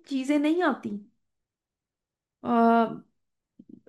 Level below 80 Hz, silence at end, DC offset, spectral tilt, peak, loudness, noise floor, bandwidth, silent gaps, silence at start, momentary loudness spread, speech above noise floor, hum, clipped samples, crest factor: -78 dBFS; 0.9 s; under 0.1%; -6 dB/octave; -10 dBFS; -25 LUFS; -90 dBFS; 12 kHz; none; 0.1 s; 17 LU; 65 dB; none; under 0.1%; 18 dB